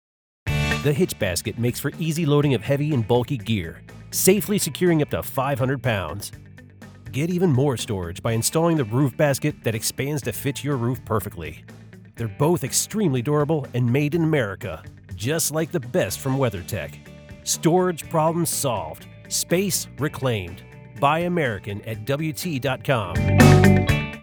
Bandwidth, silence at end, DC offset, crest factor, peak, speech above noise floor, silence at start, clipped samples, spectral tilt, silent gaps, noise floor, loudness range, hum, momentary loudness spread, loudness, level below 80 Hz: over 20 kHz; 0 s; under 0.1%; 22 dB; 0 dBFS; 22 dB; 0.45 s; under 0.1%; -5 dB/octave; none; -44 dBFS; 3 LU; none; 13 LU; -22 LUFS; -42 dBFS